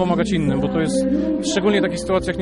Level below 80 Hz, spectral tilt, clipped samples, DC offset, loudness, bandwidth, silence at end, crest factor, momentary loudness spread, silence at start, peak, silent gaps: -38 dBFS; -5.5 dB/octave; under 0.1%; under 0.1%; -19 LUFS; 11.5 kHz; 0 s; 14 dB; 2 LU; 0 s; -4 dBFS; none